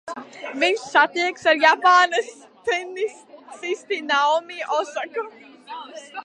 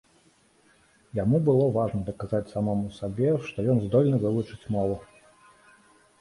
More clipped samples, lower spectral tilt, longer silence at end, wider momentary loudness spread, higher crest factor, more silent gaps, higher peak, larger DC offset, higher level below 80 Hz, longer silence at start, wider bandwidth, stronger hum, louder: neither; second, -1 dB/octave vs -9.5 dB/octave; second, 0 s vs 1.15 s; first, 21 LU vs 9 LU; about the same, 20 dB vs 16 dB; neither; first, -2 dBFS vs -10 dBFS; neither; second, -76 dBFS vs -52 dBFS; second, 0.05 s vs 1.15 s; about the same, 11 kHz vs 11.5 kHz; neither; first, -20 LUFS vs -26 LUFS